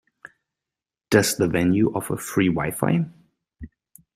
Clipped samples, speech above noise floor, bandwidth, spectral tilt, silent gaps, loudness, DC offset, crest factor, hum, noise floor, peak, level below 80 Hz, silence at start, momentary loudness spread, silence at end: under 0.1%; 68 dB; 16 kHz; -5.5 dB/octave; none; -22 LUFS; under 0.1%; 22 dB; none; -89 dBFS; -2 dBFS; -52 dBFS; 1.1 s; 6 LU; 0.5 s